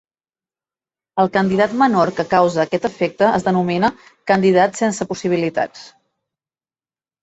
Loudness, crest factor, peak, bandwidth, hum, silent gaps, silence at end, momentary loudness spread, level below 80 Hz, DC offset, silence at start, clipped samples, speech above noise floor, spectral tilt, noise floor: -17 LUFS; 16 dB; -2 dBFS; 8.2 kHz; none; none; 1.35 s; 7 LU; -56 dBFS; under 0.1%; 1.15 s; under 0.1%; over 73 dB; -6 dB/octave; under -90 dBFS